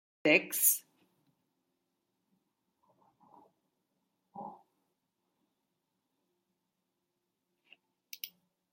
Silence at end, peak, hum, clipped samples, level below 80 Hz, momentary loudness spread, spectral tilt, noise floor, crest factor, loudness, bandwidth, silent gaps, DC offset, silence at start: 0.45 s; -10 dBFS; none; under 0.1%; under -90 dBFS; 23 LU; -1.5 dB/octave; -85 dBFS; 30 dB; -27 LUFS; 16.5 kHz; none; under 0.1%; 0.25 s